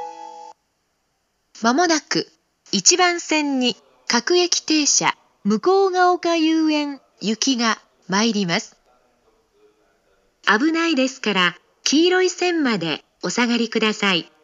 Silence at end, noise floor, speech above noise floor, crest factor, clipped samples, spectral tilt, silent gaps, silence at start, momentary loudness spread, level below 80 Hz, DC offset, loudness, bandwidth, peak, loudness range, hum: 0.2 s; -70 dBFS; 51 dB; 20 dB; under 0.1%; -2.5 dB/octave; none; 0 s; 10 LU; -74 dBFS; under 0.1%; -19 LUFS; 8 kHz; 0 dBFS; 5 LU; none